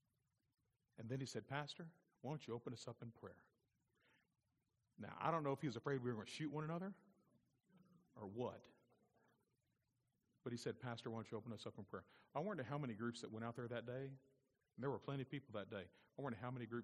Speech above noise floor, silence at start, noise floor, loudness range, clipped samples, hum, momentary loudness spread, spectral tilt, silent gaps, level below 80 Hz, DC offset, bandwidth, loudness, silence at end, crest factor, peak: 39 dB; 1 s; -88 dBFS; 8 LU; under 0.1%; none; 13 LU; -6.5 dB/octave; none; -86 dBFS; under 0.1%; 11 kHz; -49 LUFS; 0 s; 24 dB; -26 dBFS